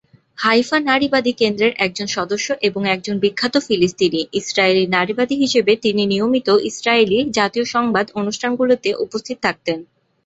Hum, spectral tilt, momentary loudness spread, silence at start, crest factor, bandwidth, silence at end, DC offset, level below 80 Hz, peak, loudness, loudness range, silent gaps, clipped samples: none; -4 dB/octave; 6 LU; 0.4 s; 18 dB; 8.2 kHz; 0.4 s; under 0.1%; -56 dBFS; 0 dBFS; -17 LUFS; 2 LU; none; under 0.1%